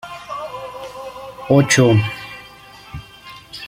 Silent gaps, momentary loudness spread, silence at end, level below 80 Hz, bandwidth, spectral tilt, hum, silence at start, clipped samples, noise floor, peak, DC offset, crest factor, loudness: none; 24 LU; 0 s; -50 dBFS; 16.5 kHz; -5 dB/octave; none; 0.05 s; under 0.1%; -41 dBFS; -2 dBFS; under 0.1%; 18 dB; -16 LUFS